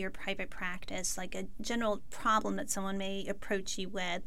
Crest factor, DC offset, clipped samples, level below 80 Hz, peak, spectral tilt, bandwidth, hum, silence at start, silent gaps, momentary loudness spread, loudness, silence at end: 18 dB; 1%; under 0.1%; -50 dBFS; -16 dBFS; -3 dB/octave; 16.5 kHz; none; 0 s; none; 8 LU; -36 LUFS; 0 s